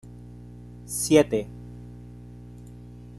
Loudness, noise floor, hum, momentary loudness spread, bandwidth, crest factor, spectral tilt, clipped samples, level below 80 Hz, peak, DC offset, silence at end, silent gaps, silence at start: -23 LUFS; -43 dBFS; 60 Hz at -40 dBFS; 25 LU; 13 kHz; 24 dB; -5 dB/octave; under 0.1%; -50 dBFS; -4 dBFS; under 0.1%; 0 s; none; 0.05 s